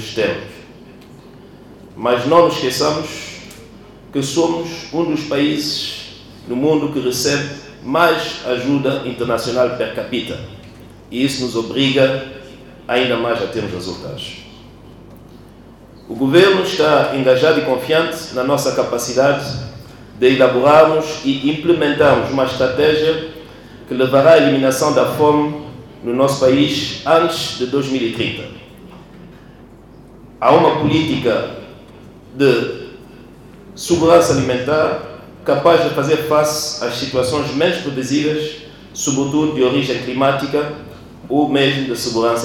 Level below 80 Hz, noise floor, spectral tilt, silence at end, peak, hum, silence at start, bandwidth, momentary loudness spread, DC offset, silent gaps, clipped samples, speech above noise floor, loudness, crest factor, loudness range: -48 dBFS; -41 dBFS; -4.5 dB/octave; 0 s; 0 dBFS; none; 0 s; 18 kHz; 16 LU; under 0.1%; none; under 0.1%; 25 dB; -16 LUFS; 16 dB; 6 LU